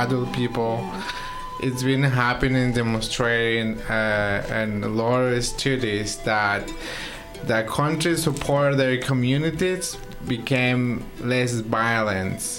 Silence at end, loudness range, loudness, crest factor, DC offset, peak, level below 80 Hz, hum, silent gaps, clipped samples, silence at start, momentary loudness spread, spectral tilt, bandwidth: 0 s; 2 LU; -23 LUFS; 16 dB; under 0.1%; -6 dBFS; -40 dBFS; none; none; under 0.1%; 0 s; 9 LU; -5 dB/octave; 16.5 kHz